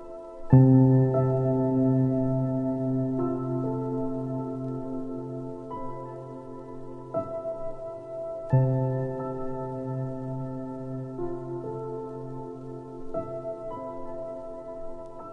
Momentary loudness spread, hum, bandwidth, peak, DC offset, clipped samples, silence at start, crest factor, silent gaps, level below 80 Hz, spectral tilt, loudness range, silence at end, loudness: 17 LU; none; 2.8 kHz; -4 dBFS; under 0.1%; under 0.1%; 0 s; 24 dB; none; -50 dBFS; -12 dB/octave; 13 LU; 0 s; -28 LUFS